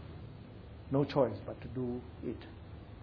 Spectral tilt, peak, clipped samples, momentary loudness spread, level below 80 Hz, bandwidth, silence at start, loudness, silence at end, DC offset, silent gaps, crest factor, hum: -7.5 dB/octave; -16 dBFS; under 0.1%; 19 LU; -56 dBFS; 5.4 kHz; 0 s; -36 LUFS; 0 s; under 0.1%; none; 22 dB; none